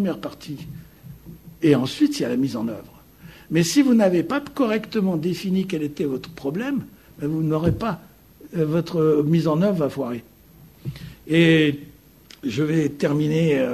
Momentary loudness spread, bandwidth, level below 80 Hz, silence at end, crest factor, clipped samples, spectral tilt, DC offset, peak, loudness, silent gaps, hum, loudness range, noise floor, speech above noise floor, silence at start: 17 LU; 13.5 kHz; -52 dBFS; 0 s; 18 dB; under 0.1%; -6.5 dB/octave; under 0.1%; -4 dBFS; -22 LUFS; none; none; 4 LU; -49 dBFS; 28 dB; 0 s